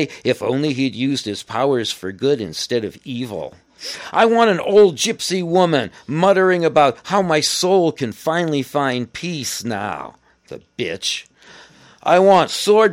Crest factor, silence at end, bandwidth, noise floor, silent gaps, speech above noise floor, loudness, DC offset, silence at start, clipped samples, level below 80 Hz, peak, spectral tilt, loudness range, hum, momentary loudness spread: 16 dB; 0 s; 16 kHz; -46 dBFS; none; 28 dB; -18 LUFS; under 0.1%; 0 s; under 0.1%; -60 dBFS; -2 dBFS; -4.5 dB/octave; 7 LU; none; 14 LU